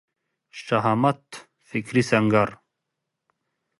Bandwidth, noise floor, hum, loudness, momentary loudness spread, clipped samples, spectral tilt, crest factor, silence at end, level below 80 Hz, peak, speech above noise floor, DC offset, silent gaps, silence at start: 11.5 kHz; -82 dBFS; none; -23 LUFS; 22 LU; under 0.1%; -6.5 dB/octave; 20 dB; 1.25 s; -62 dBFS; -6 dBFS; 60 dB; under 0.1%; none; 0.55 s